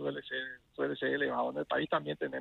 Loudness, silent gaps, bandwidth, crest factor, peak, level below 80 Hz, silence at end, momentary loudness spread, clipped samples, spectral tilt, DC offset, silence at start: -35 LUFS; none; 5.2 kHz; 16 dB; -18 dBFS; -72 dBFS; 0 s; 7 LU; under 0.1%; -7 dB/octave; under 0.1%; 0 s